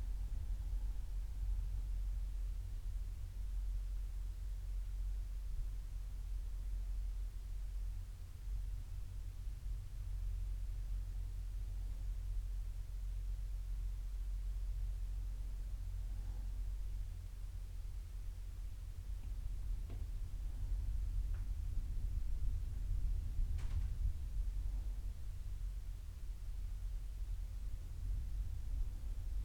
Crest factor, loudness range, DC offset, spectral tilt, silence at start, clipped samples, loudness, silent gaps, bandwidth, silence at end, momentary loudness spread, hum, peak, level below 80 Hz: 14 dB; 4 LU; under 0.1%; -6 dB/octave; 0 s; under 0.1%; -46 LUFS; none; 12 kHz; 0 s; 6 LU; none; -26 dBFS; -42 dBFS